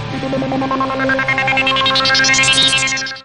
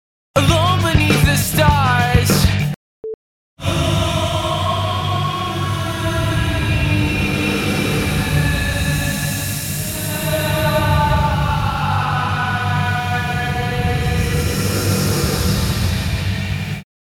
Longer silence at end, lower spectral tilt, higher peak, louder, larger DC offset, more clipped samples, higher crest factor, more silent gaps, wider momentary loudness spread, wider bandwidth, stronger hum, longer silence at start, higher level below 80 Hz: second, 0 s vs 0.3 s; second, -2 dB/octave vs -5 dB/octave; about the same, 0 dBFS vs -2 dBFS; first, -13 LUFS vs -18 LUFS; first, 0.5% vs under 0.1%; neither; about the same, 16 dB vs 16 dB; second, none vs 2.76-3.03 s, 3.14-3.57 s; about the same, 9 LU vs 7 LU; second, 12 kHz vs 18 kHz; neither; second, 0 s vs 0.35 s; second, -42 dBFS vs -28 dBFS